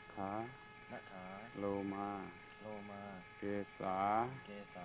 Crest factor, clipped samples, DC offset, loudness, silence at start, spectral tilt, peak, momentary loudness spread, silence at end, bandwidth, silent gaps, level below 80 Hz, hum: 20 dB; under 0.1%; under 0.1%; -44 LUFS; 0 s; -5 dB/octave; -24 dBFS; 15 LU; 0 s; 4 kHz; none; -70 dBFS; none